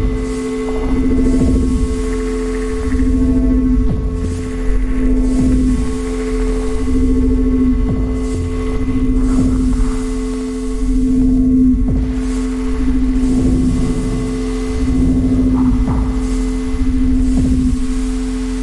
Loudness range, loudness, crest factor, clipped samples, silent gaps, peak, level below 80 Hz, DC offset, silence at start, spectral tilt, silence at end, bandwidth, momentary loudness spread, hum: 2 LU; -17 LUFS; 12 dB; under 0.1%; none; -2 dBFS; -18 dBFS; under 0.1%; 0 s; -7.5 dB/octave; 0 s; 11.5 kHz; 6 LU; none